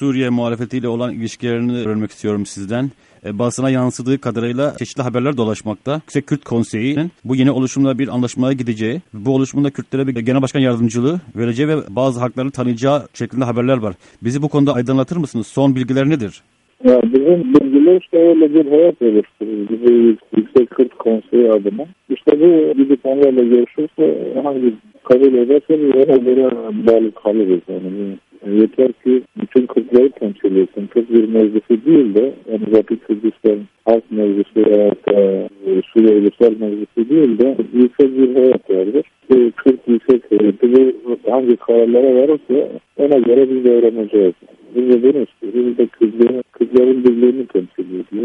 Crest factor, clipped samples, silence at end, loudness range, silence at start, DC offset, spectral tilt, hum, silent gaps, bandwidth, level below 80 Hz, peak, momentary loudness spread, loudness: 14 dB; under 0.1%; 0 s; 6 LU; 0 s; under 0.1%; -7.5 dB/octave; none; none; 10.5 kHz; -58 dBFS; 0 dBFS; 10 LU; -15 LUFS